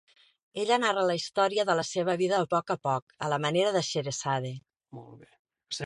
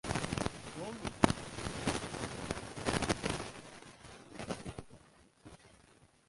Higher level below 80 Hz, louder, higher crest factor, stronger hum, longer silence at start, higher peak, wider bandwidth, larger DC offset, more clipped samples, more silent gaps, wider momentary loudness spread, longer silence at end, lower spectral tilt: second, -72 dBFS vs -54 dBFS; first, -28 LUFS vs -38 LUFS; second, 18 dB vs 30 dB; neither; first, 0.55 s vs 0.05 s; second, -12 dBFS vs -8 dBFS; about the same, 11.5 kHz vs 12 kHz; neither; neither; first, 3.02-3.07 s, 5.39-5.45 s vs none; second, 14 LU vs 21 LU; second, 0 s vs 0.35 s; about the same, -4 dB/octave vs -4.5 dB/octave